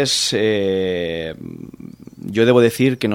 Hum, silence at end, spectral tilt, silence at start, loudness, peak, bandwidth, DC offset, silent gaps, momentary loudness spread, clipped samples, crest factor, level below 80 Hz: none; 0 s; -4.5 dB/octave; 0 s; -17 LUFS; 0 dBFS; 16.5 kHz; under 0.1%; none; 22 LU; under 0.1%; 18 dB; -52 dBFS